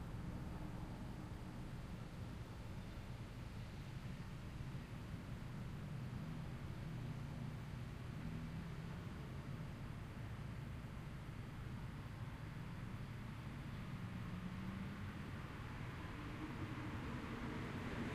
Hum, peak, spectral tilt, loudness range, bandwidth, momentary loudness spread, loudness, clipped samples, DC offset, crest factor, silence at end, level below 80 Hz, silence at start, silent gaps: none; -34 dBFS; -7 dB/octave; 3 LU; 15.5 kHz; 4 LU; -50 LUFS; under 0.1%; under 0.1%; 14 dB; 0 s; -56 dBFS; 0 s; none